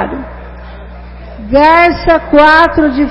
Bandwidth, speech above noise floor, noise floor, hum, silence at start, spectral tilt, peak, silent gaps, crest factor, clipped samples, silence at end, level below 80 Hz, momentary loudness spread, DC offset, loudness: 9.6 kHz; 21 dB; -28 dBFS; 60 Hz at -30 dBFS; 0 s; -6.5 dB/octave; 0 dBFS; none; 10 dB; 0.8%; 0 s; -26 dBFS; 22 LU; under 0.1%; -8 LUFS